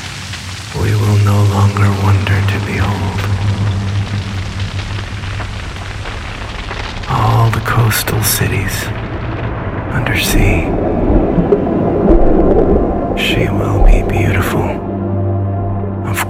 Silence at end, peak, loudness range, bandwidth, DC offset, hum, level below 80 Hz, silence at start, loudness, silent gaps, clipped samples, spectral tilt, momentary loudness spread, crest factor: 0 s; 0 dBFS; 7 LU; 16 kHz; under 0.1%; none; -20 dBFS; 0 s; -15 LUFS; none; under 0.1%; -5.5 dB/octave; 11 LU; 14 dB